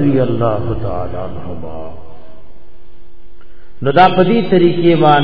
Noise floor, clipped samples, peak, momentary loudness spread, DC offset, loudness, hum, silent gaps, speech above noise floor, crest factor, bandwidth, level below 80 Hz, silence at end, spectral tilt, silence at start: -41 dBFS; 0.2%; 0 dBFS; 18 LU; 10%; -13 LUFS; none; none; 28 dB; 16 dB; 5.4 kHz; -36 dBFS; 0 s; -9.5 dB/octave; 0 s